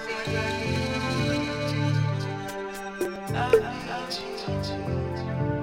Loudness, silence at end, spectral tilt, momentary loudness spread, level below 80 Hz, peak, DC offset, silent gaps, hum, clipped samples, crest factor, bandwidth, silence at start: -28 LUFS; 0 s; -6 dB/octave; 9 LU; -46 dBFS; -6 dBFS; under 0.1%; none; none; under 0.1%; 20 dB; 16.5 kHz; 0 s